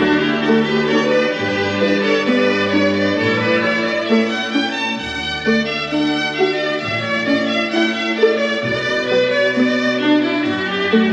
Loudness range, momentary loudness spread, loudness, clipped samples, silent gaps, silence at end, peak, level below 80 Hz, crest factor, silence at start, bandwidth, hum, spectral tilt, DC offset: 2 LU; 4 LU; -17 LUFS; under 0.1%; none; 0 s; -2 dBFS; -52 dBFS; 14 dB; 0 s; 8.8 kHz; none; -5 dB/octave; under 0.1%